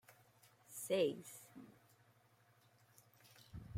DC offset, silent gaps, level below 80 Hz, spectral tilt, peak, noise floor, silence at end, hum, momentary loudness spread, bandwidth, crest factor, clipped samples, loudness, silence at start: under 0.1%; none; -74 dBFS; -4.5 dB/octave; -26 dBFS; -72 dBFS; 0 s; none; 26 LU; 16.5 kHz; 22 dB; under 0.1%; -41 LUFS; 0.1 s